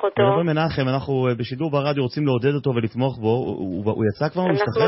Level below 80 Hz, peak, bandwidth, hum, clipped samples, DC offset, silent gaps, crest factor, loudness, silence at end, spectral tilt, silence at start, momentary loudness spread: -52 dBFS; -6 dBFS; 5.8 kHz; none; under 0.1%; under 0.1%; none; 14 dB; -22 LUFS; 0 s; -11 dB/octave; 0 s; 5 LU